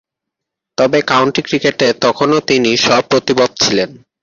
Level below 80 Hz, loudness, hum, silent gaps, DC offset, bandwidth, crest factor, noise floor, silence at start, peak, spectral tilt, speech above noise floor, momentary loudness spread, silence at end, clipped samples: -52 dBFS; -13 LUFS; none; none; under 0.1%; 7.4 kHz; 14 dB; -80 dBFS; 0.8 s; 0 dBFS; -3.5 dB/octave; 67 dB; 5 LU; 0.25 s; under 0.1%